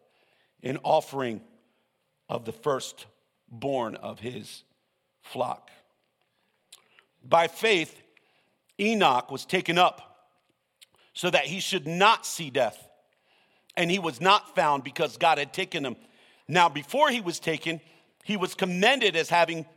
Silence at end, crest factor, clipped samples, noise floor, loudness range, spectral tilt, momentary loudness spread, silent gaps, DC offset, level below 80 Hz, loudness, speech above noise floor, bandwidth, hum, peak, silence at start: 0.15 s; 22 dB; under 0.1%; -75 dBFS; 9 LU; -3.5 dB/octave; 16 LU; none; under 0.1%; -76 dBFS; -26 LUFS; 49 dB; 17 kHz; none; -6 dBFS; 0.65 s